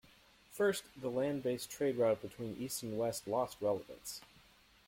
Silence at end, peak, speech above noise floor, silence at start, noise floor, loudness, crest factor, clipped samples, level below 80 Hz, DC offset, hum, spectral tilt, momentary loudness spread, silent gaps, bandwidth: 0.6 s; -22 dBFS; 28 dB; 0.5 s; -65 dBFS; -37 LUFS; 16 dB; under 0.1%; -72 dBFS; under 0.1%; none; -4.5 dB/octave; 12 LU; none; 16.5 kHz